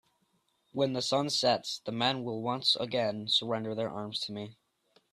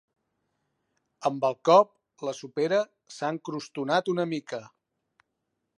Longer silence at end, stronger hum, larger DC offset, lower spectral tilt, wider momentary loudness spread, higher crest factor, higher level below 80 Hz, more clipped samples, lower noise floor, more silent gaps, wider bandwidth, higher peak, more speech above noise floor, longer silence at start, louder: second, 0.6 s vs 1.1 s; neither; neither; second, -4 dB/octave vs -5.5 dB/octave; second, 9 LU vs 16 LU; about the same, 20 dB vs 22 dB; first, -74 dBFS vs -82 dBFS; neither; second, -74 dBFS vs -81 dBFS; neither; first, 13.5 kHz vs 11.5 kHz; second, -12 dBFS vs -6 dBFS; second, 43 dB vs 55 dB; second, 0.75 s vs 1.2 s; second, -30 LUFS vs -27 LUFS